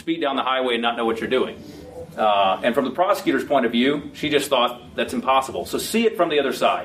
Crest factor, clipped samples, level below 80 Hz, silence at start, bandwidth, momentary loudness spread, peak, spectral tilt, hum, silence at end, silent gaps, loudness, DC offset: 18 dB; under 0.1%; -56 dBFS; 0.05 s; 15.5 kHz; 8 LU; -4 dBFS; -4 dB/octave; none; 0 s; none; -21 LUFS; under 0.1%